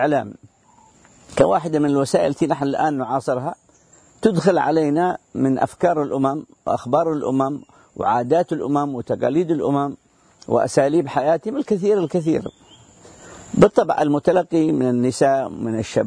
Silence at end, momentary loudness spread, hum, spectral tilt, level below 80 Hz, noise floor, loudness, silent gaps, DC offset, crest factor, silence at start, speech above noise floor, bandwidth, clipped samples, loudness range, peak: 0 s; 8 LU; none; -6.5 dB/octave; -54 dBFS; -53 dBFS; -20 LUFS; none; under 0.1%; 18 dB; 0 s; 35 dB; 11 kHz; under 0.1%; 2 LU; -2 dBFS